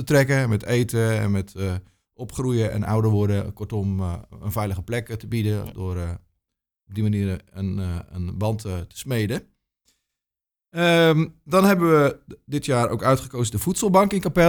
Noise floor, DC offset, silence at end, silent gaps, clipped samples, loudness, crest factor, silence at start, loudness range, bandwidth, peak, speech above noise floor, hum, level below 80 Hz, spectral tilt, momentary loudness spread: -89 dBFS; under 0.1%; 0 s; none; under 0.1%; -23 LUFS; 20 dB; 0 s; 8 LU; over 20 kHz; -4 dBFS; 68 dB; none; -46 dBFS; -6 dB/octave; 13 LU